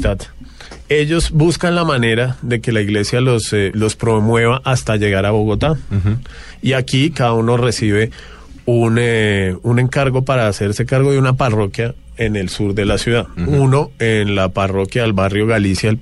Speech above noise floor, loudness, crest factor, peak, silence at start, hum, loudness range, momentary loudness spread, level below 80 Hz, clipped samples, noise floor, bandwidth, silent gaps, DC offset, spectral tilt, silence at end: 20 dB; -16 LUFS; 12 dB; -2 dBFS; 0 s; none; 1 LU; 6 LU; -32 dBFS; under 0.1%; -35 dBFS; 12 kHz; none; under 0.1%; -6 dB/octave; 0 s